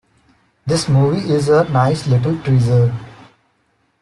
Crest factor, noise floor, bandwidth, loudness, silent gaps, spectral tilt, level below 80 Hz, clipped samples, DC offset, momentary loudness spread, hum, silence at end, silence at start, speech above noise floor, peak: 14 dB; -62 dBFS; 11.5 kHz; -15 LUFS; none; -7 dB/octave; -48 dBFS; under 0.1%; under 0.1%; 6 LU; none; 0.9 s; 0.65 s; 48 dB; -2 dBFS